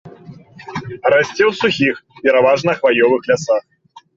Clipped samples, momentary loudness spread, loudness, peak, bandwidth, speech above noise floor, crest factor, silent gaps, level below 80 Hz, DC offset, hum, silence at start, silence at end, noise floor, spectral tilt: under 0.1%; 7 LU; -15 LUFS; -2 dBFS; 7.8 kHz; 24 dB; 14 dB; none; -56 dBFS; under 0.1%; none; 0.05 s; 0.55 s; -39 dBFS; -5 dB/octave